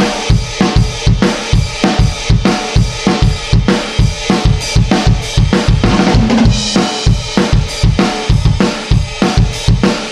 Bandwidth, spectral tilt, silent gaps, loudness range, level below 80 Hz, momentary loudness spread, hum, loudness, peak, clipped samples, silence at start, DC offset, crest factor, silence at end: 12.5 kHz; -5.5 dB/octave; none; 1 LU; -18 dBFS; 3 LU; none; -12 LUFS; 0 dBFS; under 0.1%; 0 s; 0.2%; 12 dB; 0 s